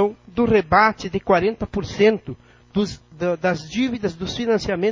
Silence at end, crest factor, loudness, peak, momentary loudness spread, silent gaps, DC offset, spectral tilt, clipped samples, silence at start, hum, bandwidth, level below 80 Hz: 0 s; 20 dB; -21 LUFS; -2 dBFS; 11 LU; none; under 0.1%; -6 dB/octave; under 0.1%; 0 s; none; 7.6 kHz; -44 dBFS